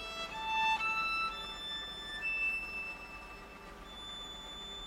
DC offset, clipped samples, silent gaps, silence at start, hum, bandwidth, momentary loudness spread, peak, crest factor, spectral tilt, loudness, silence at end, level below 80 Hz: under 0.1%; under 0.1%; none; 0 s; none; 16 kHz; 17 LU; -22 dBFS; 16 dB; -1.5 dB/octave; -36 LUFS; 0 s; -58 dBFS